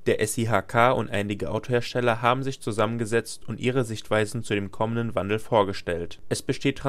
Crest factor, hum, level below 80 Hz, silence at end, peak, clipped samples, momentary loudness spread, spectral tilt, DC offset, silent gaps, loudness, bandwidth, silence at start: 20 dB; none; -52 dBFS; 0 s; -6 dBFS; under 0.1%; 8 LU; -5.5 dB/octave; under 0.1%; none; -26 LUFS; 15 kHz; 0 s